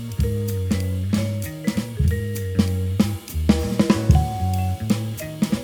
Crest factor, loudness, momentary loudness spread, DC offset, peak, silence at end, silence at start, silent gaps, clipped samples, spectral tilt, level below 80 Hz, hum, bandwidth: 18 dB; -22 LUFS; 7 LU; under 0.1%; -2 dBFS; 0 s; 0 s; none; under 0.1%; -6.5 dB/octave; -30 dBFS; none; over 20 kHz